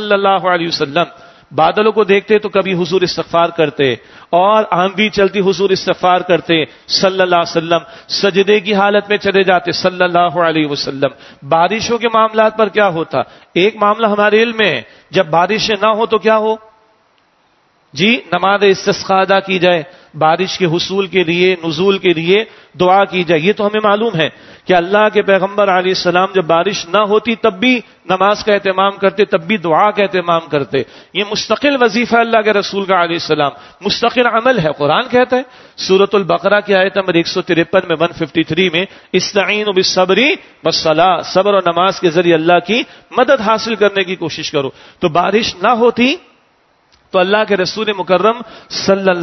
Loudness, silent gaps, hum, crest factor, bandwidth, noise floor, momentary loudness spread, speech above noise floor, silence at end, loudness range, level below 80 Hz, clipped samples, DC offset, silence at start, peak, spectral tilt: -13 LUFS; none; none; 14 dB; 6.2 kHz; -55 dBFS; 6 LU; 42 dB; 0 s; 2 LU; -52 dBFS; under 0.1%; under 0.1%; 0 s; 0 dBFS; -4.5 dB/octave